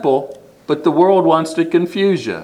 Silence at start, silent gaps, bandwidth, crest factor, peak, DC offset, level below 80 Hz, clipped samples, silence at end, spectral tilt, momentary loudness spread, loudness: 0 s; none; 11.5 kHz; 16 dB; 0 dBFS; under 0.1%; -62 dBFS; under 0.1%; 0 s; -6.5 dB/octave; 10 LU; -15 LUFS